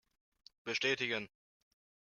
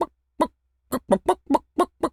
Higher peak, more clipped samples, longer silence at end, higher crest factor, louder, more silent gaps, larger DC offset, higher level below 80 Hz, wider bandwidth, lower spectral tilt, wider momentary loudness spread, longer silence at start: second, -20 dBFS vs -4 dBFS; neither; first, 0.9 s vs 0.05 s; about the same, 22 dB vs 20 dB; second, -35 LUFS vs -25 LUFS; neither; neither; second, -82 dBFS vs -54 dBFS; second, 7.2 kHz vs 16 kHz; second, -2.5 dB/octave vs -5.5 dB/octave; first, 16 LU vs 9 LU; first, 0.65 s vs 0 s